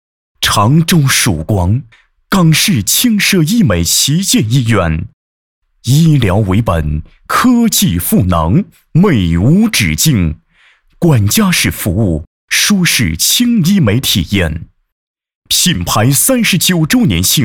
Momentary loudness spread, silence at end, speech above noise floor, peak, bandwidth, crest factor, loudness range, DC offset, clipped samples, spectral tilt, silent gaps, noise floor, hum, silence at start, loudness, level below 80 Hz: 7 LU; 0 s; 39 dB; -2 dBFS; 19 kHz; 10 dB; 2 LU; under 0.1%; under 0.1%; -4 dB/octave; 5.13-5.62 s, 12.27-12.48 s, 14.92-15.15 s, 15.35-15.42 s; -50 dBFS; none; 0.4 s; -11 LUFS; -30 dBFS